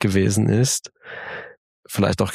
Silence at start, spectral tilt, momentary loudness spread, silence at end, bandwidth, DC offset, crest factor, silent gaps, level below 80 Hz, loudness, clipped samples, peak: 0 s; -5 dB/octave; 17 LU; 0 s; 15.5 kHz; under 0.1%; 18 dB; 1.57-1.83 s; -50 dBFS; -20 LUFS; under 0.1%; -4 dBFS